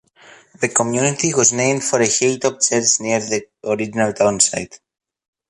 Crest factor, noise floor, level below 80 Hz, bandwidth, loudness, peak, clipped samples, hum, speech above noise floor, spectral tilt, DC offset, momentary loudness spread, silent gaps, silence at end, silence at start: 18 dB; -47 dBFS; -58 dBFS; 11.5 kHz; -17 LUFS; 0 dBFS; under 0.1%; none; 29 dB; -3 dB/octave; under 0.1%; 10 LU; none; 0.75 s; 0.6 s